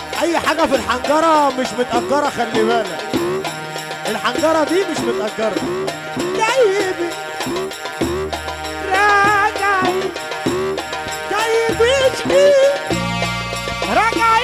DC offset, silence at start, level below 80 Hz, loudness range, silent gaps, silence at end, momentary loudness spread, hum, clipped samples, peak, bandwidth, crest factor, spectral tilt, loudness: under 0.1%; 0 s; -42 dBFS; 3 LU; none; 0 s; 10 LU; none; under 0.1%; -2 dBFS; 16 kHz; 14 dB; -4 dB/octave; -17 LUFS